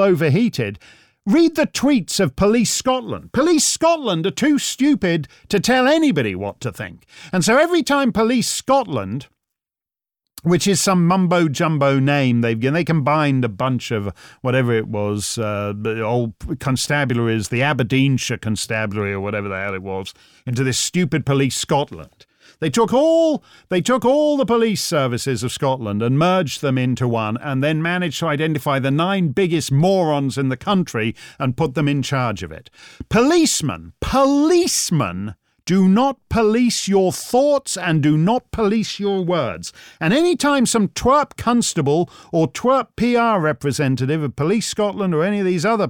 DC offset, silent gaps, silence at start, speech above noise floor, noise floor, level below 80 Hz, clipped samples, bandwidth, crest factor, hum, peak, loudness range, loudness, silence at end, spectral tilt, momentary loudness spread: under 0.1%; none; 0 s; over 72 dB; under -90 dBFS; -46 dBFS; under 0.1%; 19 kHz; 12 dB; none; -6 dBFS; 4 LU; -18 LUFS; 0 s; -5 dB/octave; 9 LU